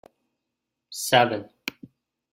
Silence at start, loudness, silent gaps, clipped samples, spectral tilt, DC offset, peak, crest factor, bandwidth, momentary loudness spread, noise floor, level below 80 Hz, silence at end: 0.9 s; -23 LUFS; none; under 0.1%; -3 dB/octave; under 0.1%; -4 dBFS; 24 dB; 16.5 kHz; 16 LU; -83 dBFS; -68 dBFS; 0.6 s